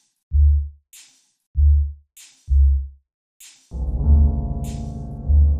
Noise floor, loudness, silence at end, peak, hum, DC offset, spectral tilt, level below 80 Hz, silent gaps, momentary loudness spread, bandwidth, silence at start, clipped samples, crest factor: -51 dBFS; -21 LUFS; 0 s; -6 dBFS; none; under 0.1%; -8.5 dB/octave; -20 dBFS; 1.47-1.54 s, 3.14-3.40 s; 14 LU; 7.8 kHz; 0.3 s; under 0.1%; 14 dB